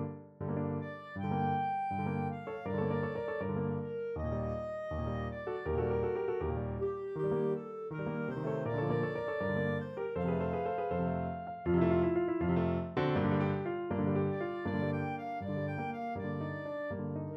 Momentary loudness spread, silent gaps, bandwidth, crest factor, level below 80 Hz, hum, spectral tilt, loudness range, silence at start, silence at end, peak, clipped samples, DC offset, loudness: 7 LU; none; 6 kHz; 18 dB; -54 dBFS; none; -10 dB/octave; 4 LU; 0 s; 0 s; -16 dBFS; under 0.1%; under 0.1%; -35 LUFS